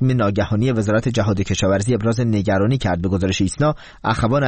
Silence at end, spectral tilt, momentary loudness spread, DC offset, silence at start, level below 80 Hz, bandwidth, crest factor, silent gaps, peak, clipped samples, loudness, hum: 0 s; -6.5 dB/octave; 2 LU; 0.3%; 0 s; -38 dBFS; 8.8 kHz; 14 dB; none; -4 dBFS; under 0.1%; -19 LUFS; none